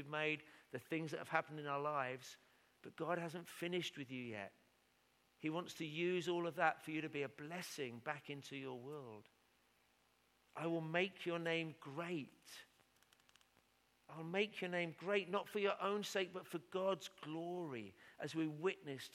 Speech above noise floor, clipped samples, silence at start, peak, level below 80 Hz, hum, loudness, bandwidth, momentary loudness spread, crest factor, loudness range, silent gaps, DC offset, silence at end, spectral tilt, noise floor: 33 dB; under 0.1%; 0 s; -20 dBFS; -90 dBFS; none; -44 LUFS; 16.5 kHz; 14 LU; 26 dB; 6 LU; none; under 0.1%; 0.05 s; -5 dB/octave; -77 dBFS